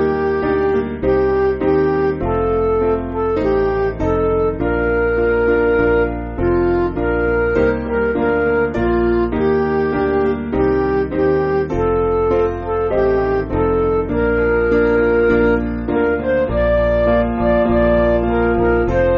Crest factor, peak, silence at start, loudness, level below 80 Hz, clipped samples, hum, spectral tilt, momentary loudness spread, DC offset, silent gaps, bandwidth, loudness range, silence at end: 12 dB; -4 dBFS; 0 s; -16 LUFS; -28 dBFS; under 0.1%; none; -7 dB/octave; 4 LU; under 0.1%; none; 5.8 kHz; 1 LU; 0 s